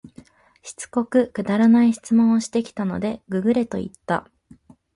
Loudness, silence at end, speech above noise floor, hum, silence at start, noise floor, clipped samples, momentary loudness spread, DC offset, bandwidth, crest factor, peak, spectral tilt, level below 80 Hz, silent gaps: -21 LUFS; 0.75 s; 31 dB; none; 0.05 s; -51 dBFS; under 0.1%; 12 LU; under 0.1%; 11.5 kHz; 14 dB; -6 dBFS; -6.5 dB/octave; -56 dBFS; none